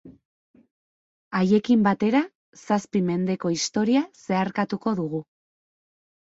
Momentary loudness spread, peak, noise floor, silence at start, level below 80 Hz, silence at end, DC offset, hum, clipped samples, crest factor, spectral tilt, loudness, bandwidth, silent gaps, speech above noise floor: 8 LU; -6 dBFS; under -90 dBFS; 0.05 s; -64 dBFS; 1.1 s; under 0.1%; none; under 0.1%; 18 dB; -5.5 dB/octave; -24 LUFS; 8 kHz; 0.25-0.54 s, 0.71-1.31 s, 2.35-2.53 s; over 67 dB